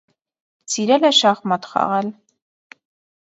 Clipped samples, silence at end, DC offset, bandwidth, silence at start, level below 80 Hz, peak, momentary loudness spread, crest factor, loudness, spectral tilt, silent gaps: under 0.1%; 1.1 s; under 0.1%; 8.2 kHz; 0.7 s; -72 dBFS; -2 dBFS; 11 LU; 18 dB; -17 LUFS; -3 dB/octave; none